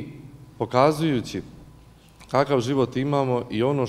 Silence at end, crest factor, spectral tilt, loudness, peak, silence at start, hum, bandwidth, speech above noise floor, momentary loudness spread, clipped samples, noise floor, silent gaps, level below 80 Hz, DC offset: 0 s; 20 dB; -6.5 dB/octave; -23 LUFS; -4 dBFS; 0 s; none; 15 kHz; 28 dB; 14 LU; under 0.1%; -50 dBFS; none; -54 dBFS; under 0.1%